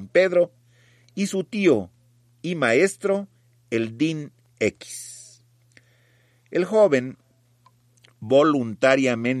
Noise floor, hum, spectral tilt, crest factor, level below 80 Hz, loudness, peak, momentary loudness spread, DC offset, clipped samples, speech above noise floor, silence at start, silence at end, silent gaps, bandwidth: -60 dBFS; none; -5.5 dB/octave; 18 dB; -68 dBFS; -22 LUFS; -6 dBFS; 19 LU; under 0.1%; under 0.1%; 39 dB; 0 s; 0 s; none; 14 kHz